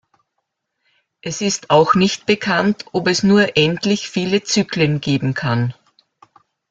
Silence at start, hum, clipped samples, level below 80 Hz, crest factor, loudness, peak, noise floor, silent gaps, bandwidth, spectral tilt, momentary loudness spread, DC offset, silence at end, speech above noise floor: 1.25 s; none; under 0.1%; -54 dBFS; 16 dB; -17 LUFS; -2 dBFS; -75 dBFS; none; 7.8 kHz; -5 dB/octave; 7 LU; under 0.1%; 1 s; 58 dB